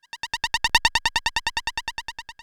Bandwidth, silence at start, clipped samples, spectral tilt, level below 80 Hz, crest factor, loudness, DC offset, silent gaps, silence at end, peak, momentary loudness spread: over 20 kHz; 0.15 s; under 0.1%; 0.5 dB/octave; -42 dBFS; 26 dB; -23 LUFS; under 0.1%; none; 0.1 s; 0 dBFS; 13 LU